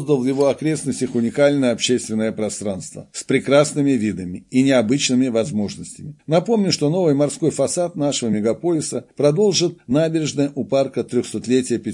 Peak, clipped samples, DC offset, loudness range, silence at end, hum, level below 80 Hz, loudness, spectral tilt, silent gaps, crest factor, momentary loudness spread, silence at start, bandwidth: -2 dBFS; under 0.1%; under 0.1%; 1 LU; 0 s; none; -60 dBFS; -19 LUFS; -5 dB/octave; none; 18 dB; 8 LU; 0 s; 11.5 kHz